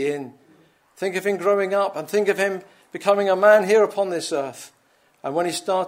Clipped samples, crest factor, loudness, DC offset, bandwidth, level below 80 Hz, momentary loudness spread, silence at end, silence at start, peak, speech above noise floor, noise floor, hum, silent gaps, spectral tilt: under 0.1%; 20 dB; -21 LUFS; under 0.1%; 16 kHz; -78 dBFS; 18 LU; 0 s; 0 s; -2 dBFS; 40 dB; -61 dBFS; none; none; -4 dB/octave